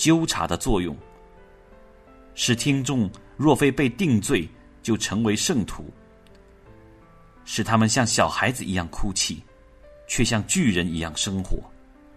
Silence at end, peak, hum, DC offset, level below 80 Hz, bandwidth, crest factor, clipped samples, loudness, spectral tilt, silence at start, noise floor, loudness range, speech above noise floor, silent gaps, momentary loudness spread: 0.5 s; -4 dBFS; none; under 0.1%; -40 dBFS; 13.5 kHz; 20 dB; under 0.1%; -23 LUFS; -4 dB/octave; 0 s; -51 dBFS; 3 LU; 28 dB; none; 15 LU